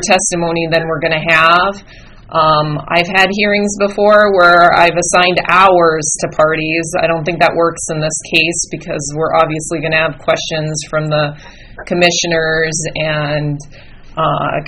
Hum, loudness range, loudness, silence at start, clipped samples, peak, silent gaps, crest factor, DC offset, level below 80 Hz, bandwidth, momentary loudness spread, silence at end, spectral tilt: none; 6 LU; -12 LUFS; 0 s; 0.2%; 0 dBFS; none; 12 dB; under 0.1%; -40 dBFS; 12.5 kHz; 10 LU; 0 s; -3.5 dB/octave